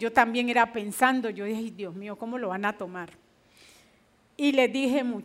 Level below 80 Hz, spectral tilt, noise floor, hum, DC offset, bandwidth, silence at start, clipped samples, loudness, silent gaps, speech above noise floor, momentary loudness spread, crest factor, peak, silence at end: -70 dBFS; -4 dB/octave; -63 dBFS; none; under 0.1%; 16 kHz; 0 s; under 0.1%; -27 LUFS; none; 36 dB; 14 LU; 24 dB; -4 dBFS; 0 s